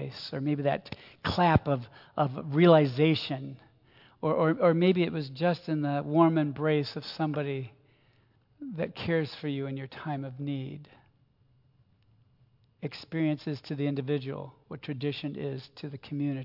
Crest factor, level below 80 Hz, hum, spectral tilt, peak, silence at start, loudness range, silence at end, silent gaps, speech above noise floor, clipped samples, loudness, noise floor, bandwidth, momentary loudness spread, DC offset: 22 dB; -60 dBFS; none; -8.5 dB/octave; -8 dBFS; 0 s; 12 LU; 0 s; none; 37 dB; under 0.1%; -29 LUFS; -66 dBFS; 5.8 kHz; 16 LU; under 0.1%